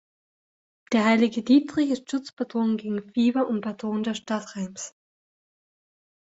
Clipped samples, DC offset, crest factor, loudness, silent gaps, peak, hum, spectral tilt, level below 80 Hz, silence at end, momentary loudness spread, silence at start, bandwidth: under 0.1%; under 0.1%; 18 dB; -25 LUFS; 2.33-2.37 s; -8 dBFS; none; -5 dB/octave; -68 dBFS; 1.35 s; 13 LU; 0.9 s; 8 kHz